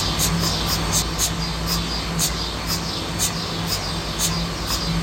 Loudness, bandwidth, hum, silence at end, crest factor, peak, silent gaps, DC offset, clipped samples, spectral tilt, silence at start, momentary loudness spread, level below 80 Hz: -22 LUFS; 16.5 kHz; none; 0 s; 16 dB; -6 dBFS; none; under 0.1%; under 0.1%; -3 dB/octave; 0 s; 5 LU; -32 dBFS